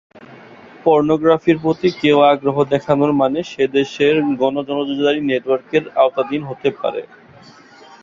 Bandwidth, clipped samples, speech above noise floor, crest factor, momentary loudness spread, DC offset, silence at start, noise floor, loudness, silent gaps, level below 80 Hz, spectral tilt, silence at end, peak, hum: 7.4 kHz; under 0.1%; 28 dB; 16 dB; 8 LU; under 0.1%; 0.15 s; -44 dBFS; -17 LUFS; none; -56 dBFS; -6.5 dB/octave; 0.95 s; -2 dBFS; none